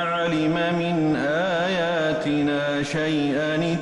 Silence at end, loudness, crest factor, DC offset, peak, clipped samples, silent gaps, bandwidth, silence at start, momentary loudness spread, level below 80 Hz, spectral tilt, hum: 0 s; -23 LUFS; 10 dB; under 0.1%; -14 dBFS; under 0.1%; none; 11 kHz; 0 s; 1 LU; -54 dBFS; -6 dB/octave; none